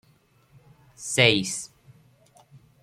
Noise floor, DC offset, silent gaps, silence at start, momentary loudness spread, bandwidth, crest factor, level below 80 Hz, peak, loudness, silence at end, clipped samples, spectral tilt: -61 dBFS; under 0.1%; none; 1 s; 20 LU; 15 kHz; 26 dB; -62 dBFS; -2 dBFS; -22 LUFS; 0.25 s; under 0.1%; -3 dB/octave